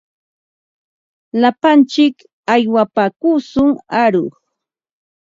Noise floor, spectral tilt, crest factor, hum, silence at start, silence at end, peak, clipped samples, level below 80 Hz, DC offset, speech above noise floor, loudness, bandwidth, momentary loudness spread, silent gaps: -77 dBFS; -6 dB/octave; 16 dB; none; 1.35 s; 1.1 s; 0 dBFS; under 0.1%; -54 dBFS; under 0.1%; 64 dB; -14 LUFS; 7.6 kHz; 8 LU; 2.33-2.43 s